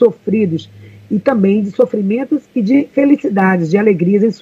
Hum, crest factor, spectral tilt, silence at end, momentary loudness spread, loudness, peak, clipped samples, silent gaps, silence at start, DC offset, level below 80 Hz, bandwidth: none; 14 dB; -9 dB/octave; 0.05 s; 5 LU; -14 LUFS; 0 dBFS; under 0.1%; none; 0 s; under 0.1%; -60 dBFS; 7.4 kHz